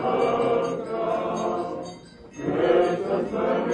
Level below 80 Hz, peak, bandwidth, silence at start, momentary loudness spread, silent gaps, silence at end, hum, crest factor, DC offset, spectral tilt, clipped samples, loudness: -58 dBFS; -8 dBFS; 9.8 kHz; 0 s; 14 LU; none; 0 s; none; 16 dB; under 0.1%; -6.5 dB/octave; under 0.1%; -25 LUFS